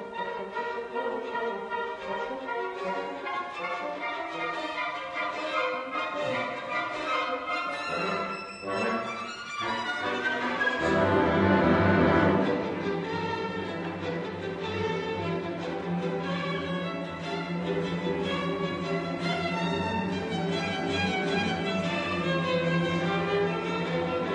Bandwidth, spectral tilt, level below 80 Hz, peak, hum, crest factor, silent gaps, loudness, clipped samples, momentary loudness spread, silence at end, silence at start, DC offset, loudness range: 10 kHz; -6 dB/octave; -56 dBFS; -10 dBFS; none; 18 dB; none; -29 LUFS; under 0.1%; 10 LU; 0 s; 0 s; under 0.1%; 8 LU